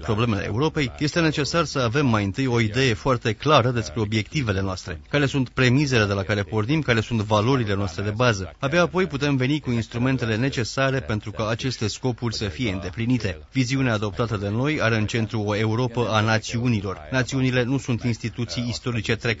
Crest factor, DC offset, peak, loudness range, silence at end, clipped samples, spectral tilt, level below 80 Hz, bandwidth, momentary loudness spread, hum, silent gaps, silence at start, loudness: 20 dB; under 0.1%; -2 dBFS; 3 LU; 0 s; under 0.1%; -5.5 dB/octave; -44 dBFS; 8 kHz; 6 LU; none; none; 0 s; -23 LUFS